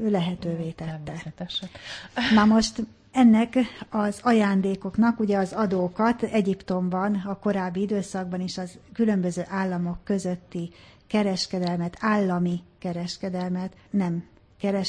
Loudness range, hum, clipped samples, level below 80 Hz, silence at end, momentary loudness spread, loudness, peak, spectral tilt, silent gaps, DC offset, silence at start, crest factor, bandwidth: 6 LU; none; under 0.1%; -54 dBFS; 0 s; 13 LU; -25 LUFS; -8 dBFS; -6 dB/octave; none; under 0.1%; 0 s; 18 dB; 10.5 kHz